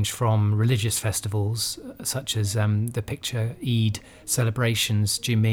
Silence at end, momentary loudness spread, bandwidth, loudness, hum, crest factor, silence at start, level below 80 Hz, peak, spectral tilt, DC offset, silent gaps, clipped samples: 0 s; 7 LU; 17.5 kHz; -24 LUFS; none; 12 dB; 0 s; -52 dBFS; -12 dBFS; -4.5 dB/octave; under 0.1%; none; under 0.1%